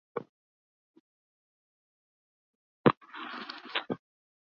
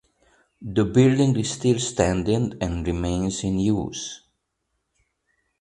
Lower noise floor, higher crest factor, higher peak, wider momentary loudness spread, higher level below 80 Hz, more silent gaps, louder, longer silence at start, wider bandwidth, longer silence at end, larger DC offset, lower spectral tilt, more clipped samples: first, under -90 dBFS vs -76 dBFS; first, 30 dB vs 20 dB; second, -8 dBFS vs -4 dBFS; about the same, 14 LU vs 13 LU; second, -72 dBFS vs -42 dBFS; first, 0.29-0.94 s, 1.00-2.84 s, 2.97-3.01 s vs none; second, -33 LUFS vs -23 LUFS; second, 0.15 s vs 0.6 s; second, 6.6 kHz vs 11 kHz; second, 0.65 s vs 1.45 s; neither; second, -4 dB/octave vs -6 dB/octave; neither